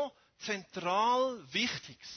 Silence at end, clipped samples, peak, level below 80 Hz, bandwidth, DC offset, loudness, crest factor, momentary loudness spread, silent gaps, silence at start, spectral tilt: 0 s; under 0.1%; -18 dBFS; -74 dBFS; 6.6 kHz; under 0.1%; -33 LUFS; 16 dB; 12 LU; none; 0 s; -3 dB/octave